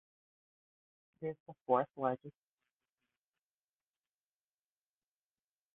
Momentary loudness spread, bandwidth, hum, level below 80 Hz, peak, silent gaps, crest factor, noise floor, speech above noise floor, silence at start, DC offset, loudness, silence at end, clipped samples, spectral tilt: 15 LU; 3.8 kHz; none; -86 dBFS; -18 dBFS; 1.40-1.46 s, 1.61-1.66 s; 26 dB; under -90 dBFS; over 53 dB; 1.2 s; under 0.1%; -38 LUFS; 3.45 s; under 0.1%; -3 dB/octave